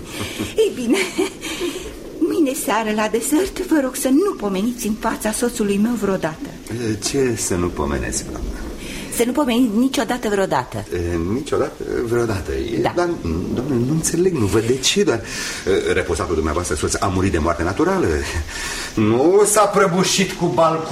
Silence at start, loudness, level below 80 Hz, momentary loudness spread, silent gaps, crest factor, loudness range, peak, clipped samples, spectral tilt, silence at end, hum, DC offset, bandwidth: 0 s; -19 LUFS; -36 dBFS; 9 LU; none; 16 dB; 4 LU; -2 dBFS; under 0.1%; -4.5 dB/octave; 0 s; none; under 0.1%; 16 kHz